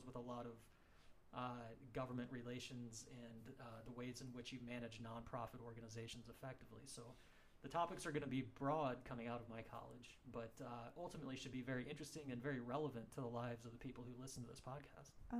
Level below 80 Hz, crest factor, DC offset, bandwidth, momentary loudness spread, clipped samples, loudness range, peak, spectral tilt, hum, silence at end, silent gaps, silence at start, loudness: -70 dBFS; 20 dB; under 0.1%; 15.5 kHz; 12 LU; under 0.1%; 6 LU; -30 dBFS; -5.5 dB/octave; none; 0 s; none; 0 s; -51 LUFS